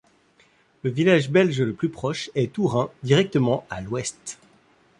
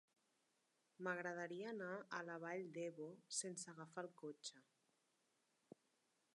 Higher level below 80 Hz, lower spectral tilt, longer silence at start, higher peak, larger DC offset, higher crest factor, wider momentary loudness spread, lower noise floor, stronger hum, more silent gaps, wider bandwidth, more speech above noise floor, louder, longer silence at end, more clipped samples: first, -56 dBFS vs under -90 dBFS; first, -6 dB/octave vs -3 dB/octave; second, 0.85 s vs 1 s; first, -4 dBFS vs -32 dBFS; neither; about the same, 20 dB vs 22 dB; about the same, 12 LU vs 10 LU; second, -60 dBFS vs -85 dBFS; neither; neither; about the same, 11.5 kHz vs 11 kHz; about the same, 37 dB vs 34 dB; first, -23 LUFS vs -50 LUFS; second, 0.65 s vs 1.75 s; neither